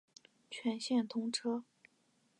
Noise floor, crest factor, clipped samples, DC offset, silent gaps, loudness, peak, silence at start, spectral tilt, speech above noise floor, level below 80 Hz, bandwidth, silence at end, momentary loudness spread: -75 dBFS; 18 dB; under 0.1%; under 0.1%; none; -37 LUFS; -22 dBFS; 0.5 s; -3.5 dB/octave; 38 dB; under -90 dBFS; 11 kHz; 0.75 s; 7 LU